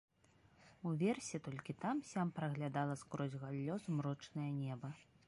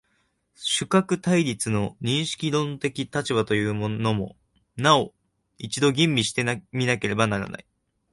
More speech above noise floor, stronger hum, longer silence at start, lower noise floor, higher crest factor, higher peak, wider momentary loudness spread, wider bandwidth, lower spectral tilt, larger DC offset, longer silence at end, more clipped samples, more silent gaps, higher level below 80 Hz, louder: second, 29 dB vs 46 dB; neither; about the same, 0.6 s vs 0.6 s; about the same, -71 dBFS vs -70 dBFS; about the same, 18 dB vs 22 dB; second, -26 dBFS vs -4 dBFS; second, 7 LU vs 12 LU; about the same, 11.5 kHz vs 11.5 kHz; first, -6.5 dB/octave vs -4.5 dB/octave; neither; second, 0.25 s vs 0.5 s; neither; neither; second, -78 dBFS vs -56 dBFS; second, -43 LUFS vs -24 LUFS